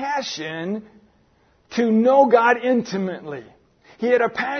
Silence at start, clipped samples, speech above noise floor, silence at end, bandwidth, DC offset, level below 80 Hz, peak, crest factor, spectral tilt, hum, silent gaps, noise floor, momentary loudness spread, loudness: 0 s; under 0.1%; 40 dB; 0 s; 6.6 kHz; under 0.1%; -66 dBFS; -2 dBFS; 18 dB; -5.5 dB/octave; none; none; -59 dBFS; 17 LU; -19 LUFS